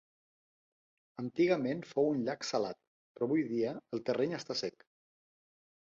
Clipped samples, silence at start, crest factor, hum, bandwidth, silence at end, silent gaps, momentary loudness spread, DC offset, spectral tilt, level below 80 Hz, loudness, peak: under 0.1%; 1.2 s; 20 dB; none; 7.8 kHz; 1.2 s; 2.87-3.15 s; 11 LU; under 0.1%; -5.5 dB/octave; -78 dBFS; -34 LUFS; -16 dBFS